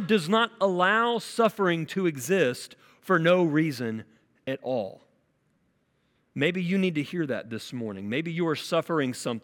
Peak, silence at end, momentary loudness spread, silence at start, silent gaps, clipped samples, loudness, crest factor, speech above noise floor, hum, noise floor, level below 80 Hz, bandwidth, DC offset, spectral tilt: -10 dBFS; 0.05 s; 13 LU; 0 s; none; under 0.1%; -26 LUFS; 18 dB; 44 dB; none; -70 dBFS; -76 dBFS; 17.5 kHz; under 0.1%; -5.5 dB/octave